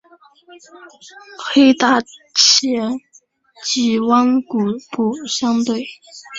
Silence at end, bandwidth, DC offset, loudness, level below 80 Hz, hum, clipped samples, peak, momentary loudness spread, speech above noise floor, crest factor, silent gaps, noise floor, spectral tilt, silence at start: 0 s; 8 kHz; under 0.1%; -16 LUFS; -62 dBFS; none; under 0.1%; 0 dBFS; 15 LU; 35 dB; 18 dB; none; -52 dBFS; -2.5 dB/octave; 0.5 s